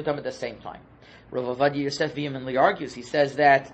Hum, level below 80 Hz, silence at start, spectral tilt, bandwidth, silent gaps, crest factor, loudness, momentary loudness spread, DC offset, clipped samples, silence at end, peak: none; -60 dBFS; 0 s; -5.5 dB/octave; 8.6 kHz; none; 20 dB; -25 LUFS; 15 LU; under 0.1%; under 0.1%; 0 s; -4 dBFS